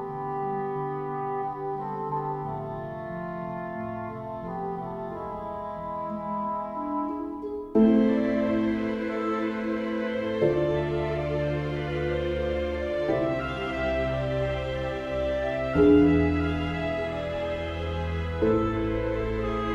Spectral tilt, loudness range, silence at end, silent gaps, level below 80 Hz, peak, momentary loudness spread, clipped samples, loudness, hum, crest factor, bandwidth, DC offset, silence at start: -8.5 dB/octave; 9 LU; 0 s; none; -42 dBFS; -10 dBFS; 12 LU; under 0.1%; -28 LUFS; none; 18 dB; 8.2 kHz; under 0.1%; 0 s